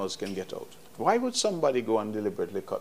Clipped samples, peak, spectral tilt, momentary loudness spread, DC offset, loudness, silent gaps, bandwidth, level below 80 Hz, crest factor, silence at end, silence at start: under 0.1%; -10 dBFS; -4 dB/octave; 13 LU; 0.3%; -29 LUFS; none; 15.5 kHz; -70 dBFS; 20 dB; 0 s; 0 s